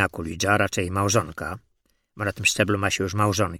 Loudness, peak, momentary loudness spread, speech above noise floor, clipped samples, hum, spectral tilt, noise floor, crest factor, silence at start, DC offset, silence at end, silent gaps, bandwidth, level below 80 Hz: -23 LUFS; -4 dBFS; 11 LU; 42 dB; under 0.1%; none; -4 dB/octave; -66 dBFS; 20 dB; 0 s; under 0.1%; 0 s; none; 17 kHz; -50 dBFS